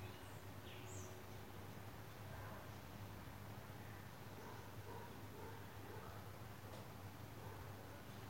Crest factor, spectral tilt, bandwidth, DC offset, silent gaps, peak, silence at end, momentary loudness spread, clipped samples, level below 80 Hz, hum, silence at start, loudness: 14 dB; -5 dB/octave; 16.5 kHz; under 0.1%; none; -40 dBFS; 0 s; 2 LU; under 0.1%; -68 dBFS; none; 0 s; -55 LUFS